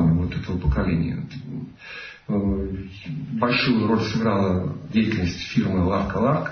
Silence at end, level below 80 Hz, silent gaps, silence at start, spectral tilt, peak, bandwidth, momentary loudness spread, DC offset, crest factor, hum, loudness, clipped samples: 0 s; -36 dBFS; none; 0 s; -7.5 dB/octave; -8 dBFS; 6.6 kHz; 14 LU; under 0.1%; 16 dB; none; -23 LUFS; under 0.1%